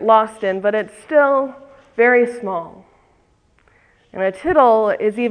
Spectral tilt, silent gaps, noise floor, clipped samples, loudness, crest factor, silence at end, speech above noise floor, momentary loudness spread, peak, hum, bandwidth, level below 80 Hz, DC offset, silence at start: -6 dB/octave; none; -58 dBFS; under 0.1%; -17 LUFS; 18 dB; 0 s; 42 dB; 14 LU; 0 dBFS; none; 10.5 kHz; -54 dBFS; under 0.1%; 0 s